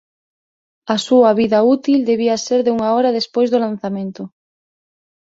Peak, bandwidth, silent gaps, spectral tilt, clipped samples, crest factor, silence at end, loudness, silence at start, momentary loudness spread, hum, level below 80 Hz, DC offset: -2 dBFS; 8 kHz; none; -5 dB/octave; under 0.1%; 16 dB; 1.05 s; -16 LUFS; 0.85 s; 14 LU; none; -60 dBFS; under 0.1%